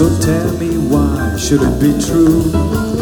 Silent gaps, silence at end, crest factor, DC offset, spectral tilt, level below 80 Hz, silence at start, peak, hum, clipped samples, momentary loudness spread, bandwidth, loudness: none; 0 s; 12 dB; under 0.1%; -6 dB/octave; -26 dBFS; 0 s; 0 dBFS; none; under 0.1%; 5 LU; 19.5 kHz; -14 LUFS